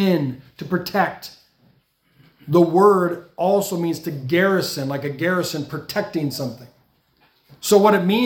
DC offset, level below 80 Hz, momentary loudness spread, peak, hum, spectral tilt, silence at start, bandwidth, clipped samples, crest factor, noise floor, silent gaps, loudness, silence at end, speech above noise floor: under 0.1%; -64 dBFS; 14 LU; -2 dBFS; none; -5.5 dB/octave; 0 s; 18 kHz; under 0.1%; 18 dB; -61 dBFS; none; -20 LUFS; 0 s; 42 dB